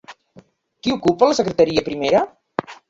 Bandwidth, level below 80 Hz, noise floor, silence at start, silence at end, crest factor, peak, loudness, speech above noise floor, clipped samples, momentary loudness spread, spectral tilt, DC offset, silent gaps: 7.8 kHz; -52 dBFS; -50 dBFS; 0.1 s; 0.15 s; 18 dB; -2 dBFS; -19 LUFS; 33 dB; under 0.1%; 10 LU; -5 dB/octave; under 0.1%; none